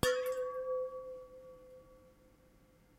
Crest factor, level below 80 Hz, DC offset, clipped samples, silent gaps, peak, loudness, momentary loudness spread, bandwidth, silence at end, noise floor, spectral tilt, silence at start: 26 dB; -62 dBFS; under 0.1%; under 0.1%; none; -14 dBFS; -39 LUFS; 22 LU; 16 kHz; 0.9 s; -65 dBFS; -3.5 dB/octave; 0.05 s